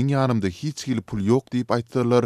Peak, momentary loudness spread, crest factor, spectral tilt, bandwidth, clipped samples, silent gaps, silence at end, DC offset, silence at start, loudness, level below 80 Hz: -6 dBFS; 7 LU; 16 dB; -7 dB/octave; 13 kHz; under 0.1%; none; 0 s; under 0.1%; 0 s; -24 LUFS; -54 dBFS